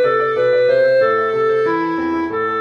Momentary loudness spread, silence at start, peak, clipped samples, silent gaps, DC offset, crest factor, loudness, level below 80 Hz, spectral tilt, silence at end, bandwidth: 6 LU; 0 s; -6 dBFS; under 0.1%; none; under 0.1%; 10 dB; -16 LUFS; -56 dBFS; -7 dB/octave; 0 s; 6.6 kHz